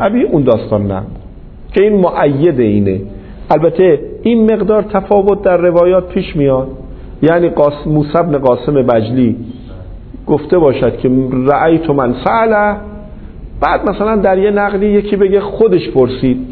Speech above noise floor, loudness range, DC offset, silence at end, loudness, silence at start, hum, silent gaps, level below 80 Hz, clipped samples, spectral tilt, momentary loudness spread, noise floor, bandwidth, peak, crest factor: 20 dB; 2 LU; under 0.1%; 0 s; -12 LUFS; 0 s; none; none; -32 dBFS; under 0.1%; -11 dB/octave; 17 LU; -31 dBFS; 4.5 kHz; 0 dBFS; 12 dB